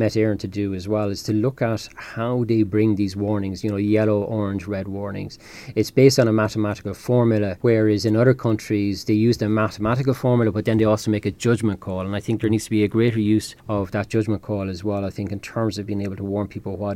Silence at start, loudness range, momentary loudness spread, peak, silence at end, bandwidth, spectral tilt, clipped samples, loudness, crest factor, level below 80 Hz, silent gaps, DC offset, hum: 0 s; 4 LU; 10 LU; -2 dBFS; 0 s; 15 kHz; -7 dB/octave; under 0.1%; -22 LUFS; 18 dB; -50 dBFS; none; under 0.1%; none